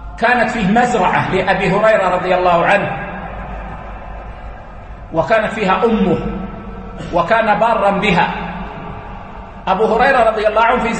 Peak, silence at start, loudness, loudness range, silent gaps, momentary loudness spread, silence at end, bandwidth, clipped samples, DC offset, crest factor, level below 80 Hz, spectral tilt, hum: 0 dBFS; 0 s; -14 LUFS; 5 LU; none; 19 LU; 0 s; 8.8 kHz; under 0.1%; under 0.1%; 16 dB; -34 dBFS; -6 dB/octave; none